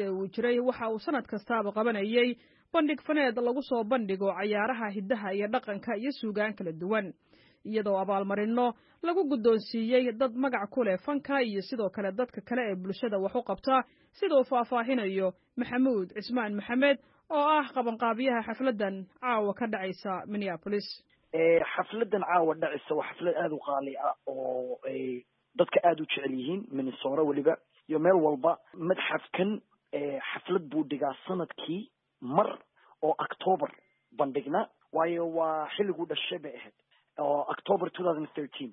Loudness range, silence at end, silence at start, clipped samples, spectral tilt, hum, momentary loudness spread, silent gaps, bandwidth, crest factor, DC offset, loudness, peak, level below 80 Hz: 4 LU; 0 s; 0 s; under 0.1%; -9.5 dB/octave; none; 9 LU; none; 5.8 kHz; 20 dB; under 0.1%; -30 LUFS; -10 dBFS; -74 dBFS